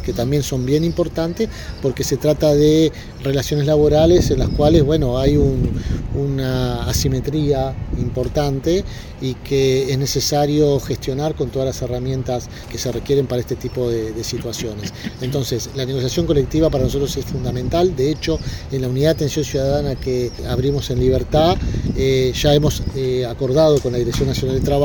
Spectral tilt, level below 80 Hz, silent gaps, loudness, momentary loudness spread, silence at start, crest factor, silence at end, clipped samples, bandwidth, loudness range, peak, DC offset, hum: -6 dB/octave; -30 dBFS; none; -19 LUFS; 10 LU; 0 s; 16 dB; 0 s; under 0.1%; 18 kHz; 6 LU; 0 dBFS; under 0.1%; none